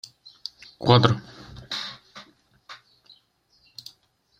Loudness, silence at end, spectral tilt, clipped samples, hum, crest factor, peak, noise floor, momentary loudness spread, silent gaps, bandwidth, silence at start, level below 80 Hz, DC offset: -23 LUFS; 1.65 s; -6.5 dB/octave; under 0.1%; none; 26 dB; -2 dBFS; -64 dBFS; 28 LU; none; 8.8 kHz; 0.8 s; -58 dBFS; under 0.1%